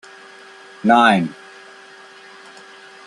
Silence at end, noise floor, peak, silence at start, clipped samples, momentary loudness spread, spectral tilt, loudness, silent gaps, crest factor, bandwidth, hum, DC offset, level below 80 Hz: 1.75 s; -43 dBFS; 0 dBFS; 0.85 s; under 0.1%; 28 LU; -5.5 dB/octave; -15 LUFS; none; 20 dB; 11.5 kHz; none; under 0.1%; -64 dBFS